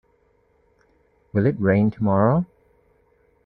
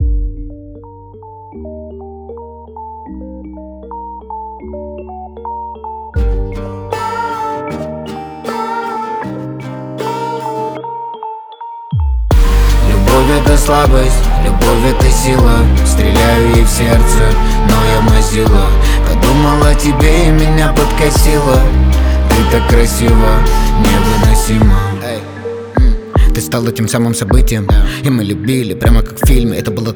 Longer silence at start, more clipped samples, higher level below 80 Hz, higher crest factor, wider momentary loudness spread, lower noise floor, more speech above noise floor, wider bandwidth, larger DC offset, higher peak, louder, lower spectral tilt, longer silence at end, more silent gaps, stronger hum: first, 1.35 s vs 0 s; neither; second, -56 dBFS vs -12 dBFS; first, 18 dB vs 10 dB; second, 7 LU vs 18 LU; first, -63 dBFS vs -33 dBFS; first, 44 dB vs 25 dB; second, 4.5 kHz vs over 20 kHz; neither; second, -6 dBFS vs 0 dBFS; second, -21 LUFS vs -12 LUFS; first, -12 dB/octave vs -5.5 dB/octave; first, 1 s vs 0 s; neither; neither